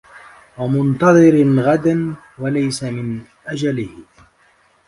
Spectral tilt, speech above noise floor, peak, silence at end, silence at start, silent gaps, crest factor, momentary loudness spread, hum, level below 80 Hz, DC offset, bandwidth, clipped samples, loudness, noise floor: -7 dB/octave; 40 dB; 0 dBFS; 0.85 s; 0.15 s; none; 16 dB; 16 LU; none; -52 dBFS; under 0.1%; 11.5 kHz; under 0.1%; -16 LUFS; -55 dBFS